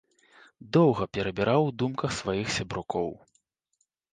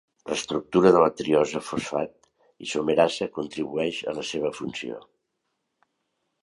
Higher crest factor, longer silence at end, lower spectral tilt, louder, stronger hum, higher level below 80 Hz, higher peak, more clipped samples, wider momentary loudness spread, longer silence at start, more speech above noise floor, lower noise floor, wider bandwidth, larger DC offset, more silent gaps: about the same, 20 dB vs 22 dB; second, 1 s vs 1.45 s; about the same, -6 dB/octave vs -5 dB/octave; about the same, -27 LUFS vs -25 LUFS; neither; first, -56 dBFS vs -62 dBFS; second, -10 dBFS vs -4 dBFS; neither; second, 9 LU vs 14 LU; first, 0.65 s vs 0.25 s; second, 49 dB vs 54 dB; about the same, -76 dBFS vs -78 dBFS; second, 9.8 kHz vs 11.5 kHz; neither; neither